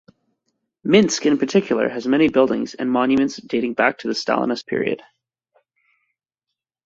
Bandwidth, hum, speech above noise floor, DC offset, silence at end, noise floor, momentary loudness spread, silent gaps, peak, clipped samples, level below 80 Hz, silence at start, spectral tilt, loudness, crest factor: 7.8 kHz; none; 65 dB; under 0.1%; 1.9 s; -83 dBFS; 8 LU; none; -2 dBFS; under 0.1%; -60 dBFS; 0.85 s; -4.5 dB/octave; -19 LUFS; 20 dB